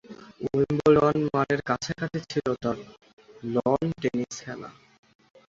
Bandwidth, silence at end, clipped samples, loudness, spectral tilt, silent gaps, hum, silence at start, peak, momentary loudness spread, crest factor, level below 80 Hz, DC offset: 7.8 kHz; 0.8 s; under 0.1%; -26 LUFS; -6.5 dB/octave; 3.13-3.17 s; none; 0.1 s; -8 dBFS; 18 LU; 20 dB; -56 dBFS; under 0.1%